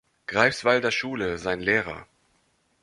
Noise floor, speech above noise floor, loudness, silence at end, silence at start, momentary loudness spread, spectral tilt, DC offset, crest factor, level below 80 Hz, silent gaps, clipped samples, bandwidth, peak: -68 dBFS; 43 dB; -24 LUFS; 0.8 s; 0.3 s; 9 LU; -4 dB/octave; under 0.1%; 24 dB; -56 dBFS; none; under 0.1%; 11.5 kHz; -4 dBFS